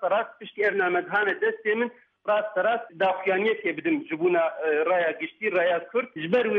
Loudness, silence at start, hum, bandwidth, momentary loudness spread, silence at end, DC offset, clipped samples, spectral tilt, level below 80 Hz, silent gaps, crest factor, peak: -25 LUFS; 0 s; none; 5.6 kHz; 5 LU; 0 s; under 0.1%; under 0.1%; -7.5 dB/octave; -78 dBFS; none; 14 dB; -12 dBFS